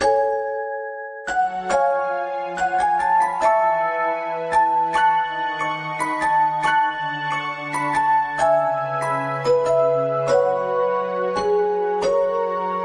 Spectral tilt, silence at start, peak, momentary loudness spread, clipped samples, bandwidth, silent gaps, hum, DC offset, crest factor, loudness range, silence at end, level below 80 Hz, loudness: -4.5 dB/octave; 0 s; -6 dBFS; 7 LU; under 0.1%; 10.5 kHz; none; none; under 0.1%; 14 dB; 2 LU; 0 s; -56 dBFS; -21 LUFS